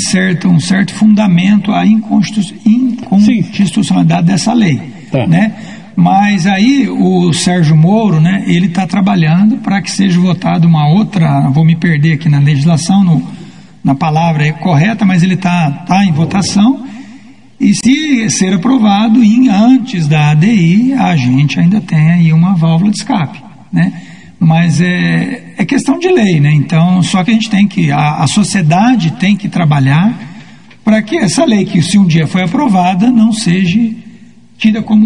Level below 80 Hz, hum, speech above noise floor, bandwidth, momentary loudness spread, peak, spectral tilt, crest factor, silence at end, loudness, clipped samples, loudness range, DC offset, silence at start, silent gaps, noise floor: -48 dBFS; none; 29 dB; 10.5 kHz; 6 LU; 0 dBFS; -6 dB/octave; 10 dB; 0 s; -10 LUFS; under 0.1%; 3 LU; 0.9%; 0 s; none; -38 dBFS